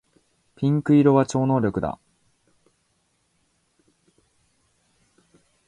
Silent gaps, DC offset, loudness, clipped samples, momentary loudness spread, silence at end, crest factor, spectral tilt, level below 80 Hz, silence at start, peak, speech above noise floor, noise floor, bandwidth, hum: none; under 0.1%; -21 LUFS; under 0.1%; 13 LU; 3.75 s; 22 dB; -8 dB/octave; -56 dBFS; 0.6 s; -4 dBFS; 50 dB; -69 dBFS; 10 kHz; none